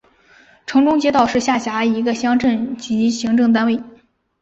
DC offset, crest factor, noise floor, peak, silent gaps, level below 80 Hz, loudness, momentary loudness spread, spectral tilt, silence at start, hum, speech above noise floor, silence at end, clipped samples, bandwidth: under 0.1%; 14 dB; -51 dBFS; -4 dBFS; none; -54 dBFS; -17 LUFS; 7 LU; -4.5 dB/octave; 0.7 s; none; 35 dB; 0.5 s; under 0.1%; 8 kHz